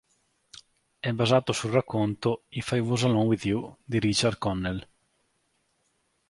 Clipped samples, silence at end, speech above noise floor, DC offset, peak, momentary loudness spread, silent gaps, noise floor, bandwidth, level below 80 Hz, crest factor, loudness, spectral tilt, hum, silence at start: under 0.1%; 1.5 s; 47 dB; under 0.1%; -8 dBFS; 9 LU; none; -73 dBFS; 11.5 kHz; -54 dBFS; 20 dB; -27 LUFS; -5.5 dB/octave; none; 1.05 s